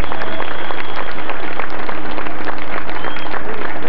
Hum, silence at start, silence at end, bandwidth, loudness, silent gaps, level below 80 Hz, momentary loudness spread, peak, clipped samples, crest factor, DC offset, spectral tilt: none; 0 s; 0 s; 6.2 kHz; -25 LUFS; none; -42 dBFS; 1 LU; 0 dBFS; under 0.1%; 18 dB; 50%; -3 dB/octave